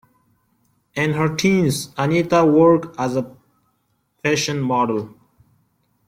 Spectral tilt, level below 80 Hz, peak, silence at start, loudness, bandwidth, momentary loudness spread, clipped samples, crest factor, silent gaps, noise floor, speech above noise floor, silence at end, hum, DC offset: -5.5 dB/octave; -56 dBFS; -2 dBFS; 0.95 s; -18 LUFS; 16 kHz; 12 LU; under 0.1%; 18 dB; none; -67 dBFS; 50 dB; 1 s; none; under 0.1%